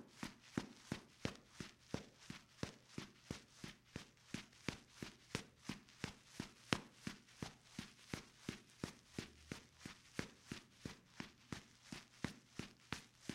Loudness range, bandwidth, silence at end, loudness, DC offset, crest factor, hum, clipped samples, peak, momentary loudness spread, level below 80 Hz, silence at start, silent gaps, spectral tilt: 4 LU; 16 kHz; 0 s; -52 LUFS; under 0.1%; 40 dB; none; under 0.1%; -12 dBFS; 7 LU; -70 dBFS; 0 s; none; -4 dB/octave